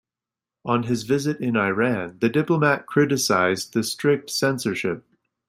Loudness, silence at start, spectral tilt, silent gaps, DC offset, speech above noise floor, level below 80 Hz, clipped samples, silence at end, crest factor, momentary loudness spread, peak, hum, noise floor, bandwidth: -22 LUFS; 0.65 s; -5 dB/octave; none; under 0.1%; 67 dB; -62 dBFS; under 0.1%; 0.5 s; 18 dB; 6 LU; -4 dBFS; none; -89 dBFS; 16 kHz